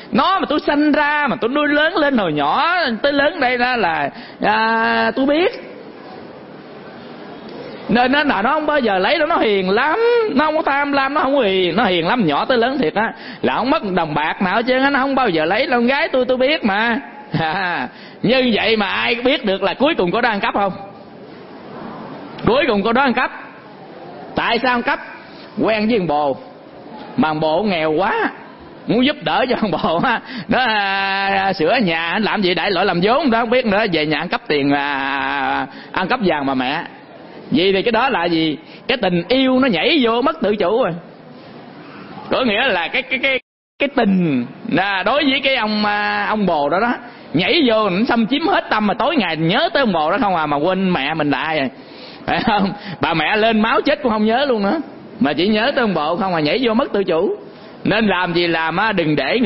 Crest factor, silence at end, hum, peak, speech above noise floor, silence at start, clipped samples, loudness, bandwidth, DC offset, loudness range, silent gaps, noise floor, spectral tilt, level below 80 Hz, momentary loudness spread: 18 dB; 0 s; none; 0 dBFS; 21 dB; 0 s; under 0.1%; -17 LUFS; 5.8 kHz; under 0.1%; 4 LU; 43.42-43.79 s; -38 dBFS; -10 dB/octave; -48 dBFS; 15 LU